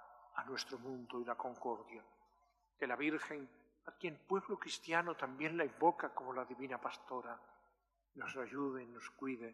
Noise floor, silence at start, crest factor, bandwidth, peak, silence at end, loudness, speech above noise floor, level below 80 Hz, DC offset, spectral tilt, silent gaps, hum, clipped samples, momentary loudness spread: -80 dBFS; 0 s; 24 dB; 13 kHz; -20 dBFS; 0 s; -42 LUFS; 38 dB; -86 dBFS; under 0.1%; -4.5 dB/octave; none; none; under 0.1%; 14 LU